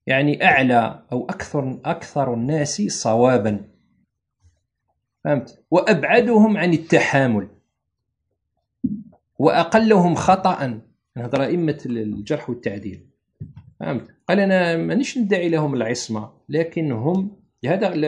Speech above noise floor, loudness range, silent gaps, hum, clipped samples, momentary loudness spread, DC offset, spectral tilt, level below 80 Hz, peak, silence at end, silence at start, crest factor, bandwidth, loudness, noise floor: 58 dB; 5 LU; none; none; under 0.1%; 14 LU; under 0.1%; -6 dB/octave; -58 dBFS; 0 dBFS; 0 s; 0.05 s; 20 dB; 10.5 kHz; -20 LUFS; -77 dBFS